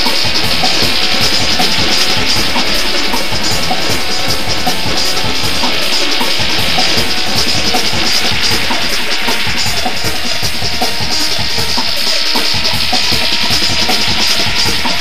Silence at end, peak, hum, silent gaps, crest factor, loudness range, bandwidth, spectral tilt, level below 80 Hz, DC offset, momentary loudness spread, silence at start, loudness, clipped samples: 0 s; 0 dBFS; none; none; 16 dB; 2 LU; 16.5 kHz; -2 dB/octave; -32 dBFS; 20%; 4 LU; 0 s; -12 LUFS; under 0.1%